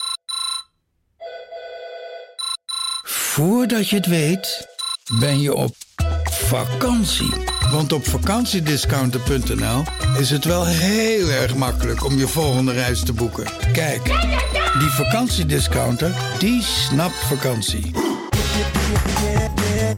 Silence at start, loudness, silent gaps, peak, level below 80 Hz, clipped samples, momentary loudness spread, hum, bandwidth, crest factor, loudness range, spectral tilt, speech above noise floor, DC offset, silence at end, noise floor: 0 s; -19 LUFS; none; -8 dBFS; -30 dBFS; under 0.1%; 8 LU; none; 17 kHz; 12 dB; 2 LU; -4.5 dB/octave; 49 dB; under 0.1%; 0 s; -68 dBFS